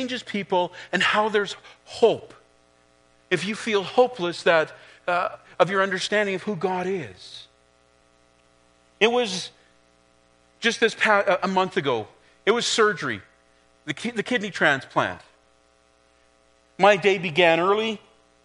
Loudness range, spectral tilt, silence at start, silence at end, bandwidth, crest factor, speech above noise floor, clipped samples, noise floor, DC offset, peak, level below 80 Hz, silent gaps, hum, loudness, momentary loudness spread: 5 LU; -4 dB/octave; 0 s; 0.5 s; 10.5 kHz; 24 dB; 38 dB; under 0.1%; -61 dBFS; under 0.1%; -2 dBFS; -68 dBFS; none; 60 Hz at -60 dBFS; -23 LUFS; 14 LU